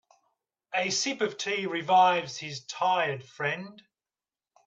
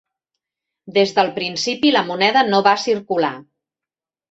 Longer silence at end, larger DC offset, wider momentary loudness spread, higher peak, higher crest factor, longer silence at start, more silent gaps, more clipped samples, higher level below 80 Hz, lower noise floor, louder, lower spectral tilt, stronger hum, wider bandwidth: about the same, 0.85 s vs 0.9 s; neither; first, 15 LU vs 7 LU; second, -10 dBFS vs -2 dBFS; about the same, 18 dB vs 18 dB; second, 0.7 s vs 0.85 s; neither; neither; second, -80 dBFS vs -66 dBFS; about the same, under -90 dBFS vs -89 dBFS; second, -28 LUFS vs -17 LUFS; second, -2.5 dB/octave vs -4 dB/octave; neither; about the same, 8.4 kHz vs 8.2 kHz